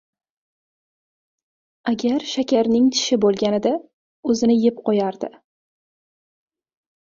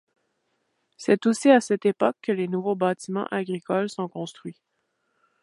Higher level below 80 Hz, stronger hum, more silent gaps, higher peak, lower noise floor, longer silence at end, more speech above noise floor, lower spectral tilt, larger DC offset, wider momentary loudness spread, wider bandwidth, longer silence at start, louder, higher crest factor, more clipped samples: first, -64 dBFS vs -76 dBFS; neither; first, 3.93-4.23 s vs none; about the same, -6 dBFS vs -4 dBFS; first, under -90 dBFS vs -74 dBFS; first, 1.8 s vs 0.9 s; first, over 71 dB vs 50 dB; about the same, -4.5 dB/octave vs -5.5 dB/octave; neither; second, 12 LU vs 15 LU; second, 7.6 kHz vs 11.5 kHz; first, 1.85 s vs 1 s; first, -20 LUFS vs -24 LUFS; about the same, 16 dB vs 20 dB; neither